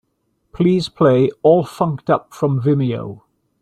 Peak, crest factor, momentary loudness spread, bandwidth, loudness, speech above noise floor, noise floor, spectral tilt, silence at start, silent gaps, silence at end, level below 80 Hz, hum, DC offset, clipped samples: -2 dBFS; 16 dB; 7 LU; 13 kHz; -17 LUFS; 52 dB; -68 dBFS; -8 dB/octave; 0.55 s; none; 0.45 s; -52 dBFS; none; under 0.1%; under 0.1%